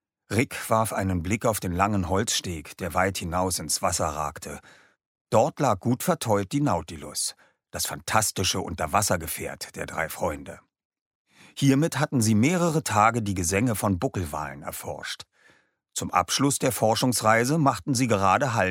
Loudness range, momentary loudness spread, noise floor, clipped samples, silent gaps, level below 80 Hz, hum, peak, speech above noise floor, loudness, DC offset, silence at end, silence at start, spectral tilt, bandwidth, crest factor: 4 LU; 12 LU; -62 dBFS; under 0.1%; 5.06-5.15 s, 5.21-5.25 s, 10.85-10.90 s, 11.01-11.25 s; -50 dBFS; none; -6 dBFS; 37 dB; -25 LUFS; under 0.1%; 0 s; 0.3 s; -4.5 dB/octave; 16.5 kHz; 20 dB